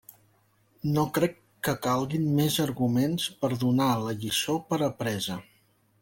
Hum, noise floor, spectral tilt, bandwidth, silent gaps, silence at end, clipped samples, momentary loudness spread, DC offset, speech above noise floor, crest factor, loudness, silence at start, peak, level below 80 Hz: none; -66 dBFS; -5 dB/octave; 17 kHz; none; 0.6 s; under 0.1%; 7 LU; under 0.1%; 39 dB; 18 dB; -27 LUFS; 0.85 s; -10 dBFS; -60 dBFS